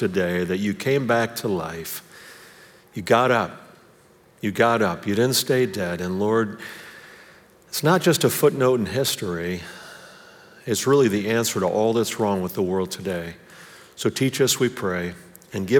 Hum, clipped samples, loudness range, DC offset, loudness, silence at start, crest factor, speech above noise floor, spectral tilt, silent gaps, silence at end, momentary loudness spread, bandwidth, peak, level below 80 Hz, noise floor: none; under 0.1%; 3 LU; under 0.1%; -22 LUFS; 0 s; 20 dB; 32 dB; -4.5 dB/octave; none; 0 s; 19 LU; over 20 kHz; -4 dBFS; -64 dBFS; -54 dBFS